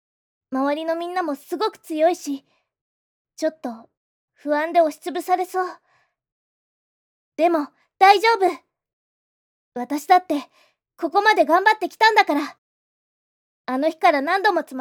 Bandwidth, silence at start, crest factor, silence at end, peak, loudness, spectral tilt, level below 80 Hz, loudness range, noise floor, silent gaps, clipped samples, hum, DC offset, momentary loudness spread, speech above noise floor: 19.5 kHz; 0.5 s; 22 dB; 0 s; 0 dBFS; -20 LUFS; -2 dB/octave; -86 dBFS; 7 LU; under -90 dBFS; 2.81-3.25 s, 3.97-4.28 s, 6.32-7.32 s, 8.93-9.72 s, 12.58-13.65 s; under 0.1%; none; under 0.1%; 17 LU; over 70 dB